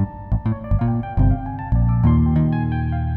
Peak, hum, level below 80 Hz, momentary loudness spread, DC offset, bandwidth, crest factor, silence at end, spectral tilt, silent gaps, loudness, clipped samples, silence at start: -6 dBFS; none; -24 dBFS; 7 LU; under 0.1%; 4.1 kHz; 12 dB; 0 s; -12 dB/octave; none; -20 LUFS; under 0.1%; 0 s